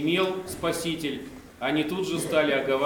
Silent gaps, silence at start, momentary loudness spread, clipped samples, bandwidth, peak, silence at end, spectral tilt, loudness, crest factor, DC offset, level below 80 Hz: none; 0 s; 9 LU; under 0.1%; 19.5 kHz; -8 dBFS; 0 s; -4.5 dB/octave; -27 LUFS; 18 dB; under 0.1%; -56 dBFS